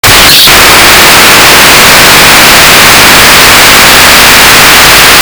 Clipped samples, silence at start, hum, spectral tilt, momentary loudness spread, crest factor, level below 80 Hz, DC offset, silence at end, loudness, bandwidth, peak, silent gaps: 100%; 0.05 s; none; -1 dB/octave; 0 LU; 0 dB; -22 dBFS; under 0.1%; 0 s; 2 LUFS; over 20 kHz; 0 dBFS; none